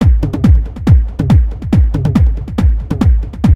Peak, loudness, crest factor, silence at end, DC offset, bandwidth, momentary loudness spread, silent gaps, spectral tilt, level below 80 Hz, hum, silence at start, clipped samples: 0 dBFS; -13 LUFS; 10 dB; 0 s; under 0.1%; 7.4 kHz; 3 LU; none; -9 dB/octave; -14 dBFS; none; 0 s; 0.2%